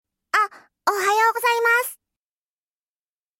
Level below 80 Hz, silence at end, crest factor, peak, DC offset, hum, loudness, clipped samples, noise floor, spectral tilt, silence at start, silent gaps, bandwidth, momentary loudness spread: -80 dBFS; 1.45 s; 18 dB; -6 dBFS; under 0.1%; none; -20 LUFS; under 0.1%; under -90 dBFS; 0.5 dB/octave; 0.35 s; none; 16.5 kHz; 8 LU